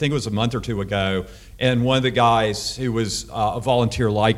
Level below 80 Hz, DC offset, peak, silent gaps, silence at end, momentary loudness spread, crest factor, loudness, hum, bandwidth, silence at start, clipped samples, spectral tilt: -42 dBFS; under 0.1%; -4 dBFS; none; 0 s; 7 LU; 16 dB; -21 LUFS; none; 14.5 kHz; 0 s; under 0.1%; -5 dB/octave